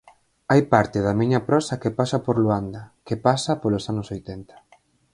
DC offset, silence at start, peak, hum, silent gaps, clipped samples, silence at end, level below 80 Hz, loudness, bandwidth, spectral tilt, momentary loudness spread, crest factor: under 0.1%; 0.5 s; 0 dBFS; none; none; under 0.1%; 0.7 s; -50 dBFS; -22 LUFS; 11.5 kHz; -6.5 dB/octave; 15 LU; 22 dB